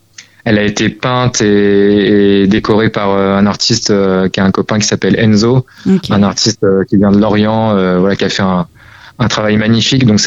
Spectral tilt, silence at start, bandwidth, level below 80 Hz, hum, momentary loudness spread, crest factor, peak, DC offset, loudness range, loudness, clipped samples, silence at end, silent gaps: -5 dB/octave; 0.2 s; 8 kHz; -40 dBFS; none; 5 LU; 10 dB; 0 dBFS; under 0.1%; 1 LU; -11 LUFS; under 0.1%; 0 s; none